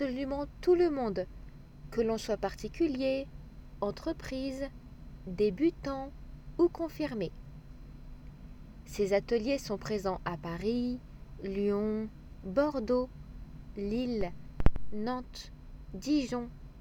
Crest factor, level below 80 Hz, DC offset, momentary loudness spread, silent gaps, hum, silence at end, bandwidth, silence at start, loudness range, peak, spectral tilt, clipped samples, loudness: 24 dB; -44 dBFS; under 0.1%; 21 LU; none; none; 0 s; 17.5 kHz; 0 s; 3 LU; -8 dBFS; -6.5 dB/octave; under 0.1%; -33 LUFS